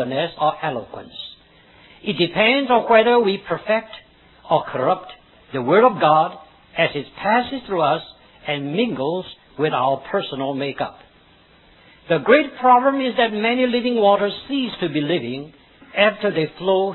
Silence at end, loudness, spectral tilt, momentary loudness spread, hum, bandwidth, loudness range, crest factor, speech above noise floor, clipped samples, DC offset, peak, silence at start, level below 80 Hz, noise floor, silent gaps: 0 s; -19 LUFS; -8.5 dB/octave; 15 LU; none; 4.3 kHz; 5 LU; 20 dB; 33 dB; under 0.1%; under 0.1%; 0 dBFS; 0 s; -58 dBFS; -52 dBFS; none